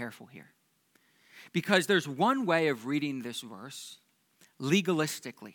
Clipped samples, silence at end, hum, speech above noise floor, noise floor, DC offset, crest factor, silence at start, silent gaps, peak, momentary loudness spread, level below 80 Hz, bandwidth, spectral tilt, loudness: under 0.1%; 0.05 s; none; 39 dB; -69 dBFS; under 0.1%; 24 dB; 0 s; none; -8 dBFS; 17 LU; -88 dBFS; 19 kHz; -4.5 dB/octave; -29 LUFS